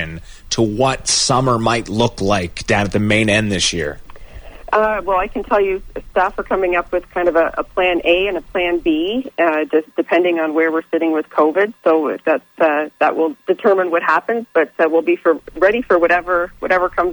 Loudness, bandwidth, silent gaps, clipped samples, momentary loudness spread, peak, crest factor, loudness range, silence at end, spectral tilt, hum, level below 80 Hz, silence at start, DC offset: -16 LUFS; over 20 kHz; none; under 0.1%; 5 LU; -2 dBFS; 14 dB; 2 LU; 0 s; -4 dB/octave; none; -40 dBFS; 0 s; under 0.1%